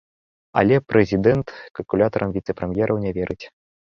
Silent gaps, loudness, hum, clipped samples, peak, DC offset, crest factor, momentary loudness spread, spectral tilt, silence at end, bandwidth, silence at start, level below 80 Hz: 1.71-1.75 s; -21 LUFS; none; under 0.1%; -2 dBFS; under 0.1%; 20 dB; 12 LU; -8.5 dB/octave; 0.4 s; 6.8 kHz; 0.55 s; -46 dBFS